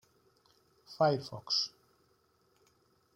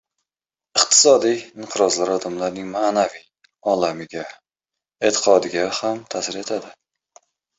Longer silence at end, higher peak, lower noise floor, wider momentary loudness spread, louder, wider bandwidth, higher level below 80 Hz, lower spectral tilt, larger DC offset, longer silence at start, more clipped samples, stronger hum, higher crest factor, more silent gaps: first, 1.45 s vs 0.85 s; second, -16 dBFS vs -2 dBFS; second, -72 dBFS vs under -90 dBFS; second, 9 LU vs 15 LU; second, -32 LUFS vs -19 LUFS; first, 16 kHz vs 8.4 kHz; second, -76 dBFS vs -64 dBFS; first, -4.5 dB/octave vs -2 dB/octave; neither; first, 0.9 s vs 0.75 s; neither; neither; about the same, 22 dB vs 20 dB; neither